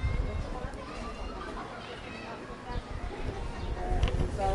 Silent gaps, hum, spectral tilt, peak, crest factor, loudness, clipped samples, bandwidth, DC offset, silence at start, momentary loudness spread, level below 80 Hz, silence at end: none; none; -6.5 dB/octave; -16 dBFS; 18 dB; -37 LUFS; under 0.1%; 11.5 kHz; under 0.1%; 0 s; 9 LU; -36 dBFS; 0 s